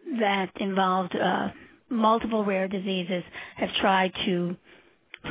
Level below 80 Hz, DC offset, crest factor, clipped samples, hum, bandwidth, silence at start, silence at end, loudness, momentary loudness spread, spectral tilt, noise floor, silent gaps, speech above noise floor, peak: -60 dBFS; under 0.1%; 18 dB; under 0.1%; none; 4 kHz; 0.05 s; 0 s; -26 LUFS; 10 LU; -9.5 dB/octave; -57 dBFS; none; 31 dB; -8 dBFS